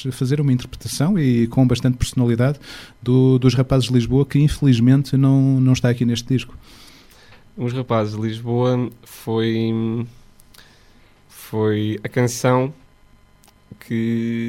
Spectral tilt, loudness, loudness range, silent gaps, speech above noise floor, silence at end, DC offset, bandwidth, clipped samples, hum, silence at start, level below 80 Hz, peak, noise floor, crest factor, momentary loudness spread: -7 dB/octave; -19 LUFS; 7 LU; none; 34 dB; 0 s; under 0.1%; 14.5 kHz; under 0.1%; none; 0 s; -40 dBFS; -2 dBFS; -52 dBFS; 16 dB; 12 LU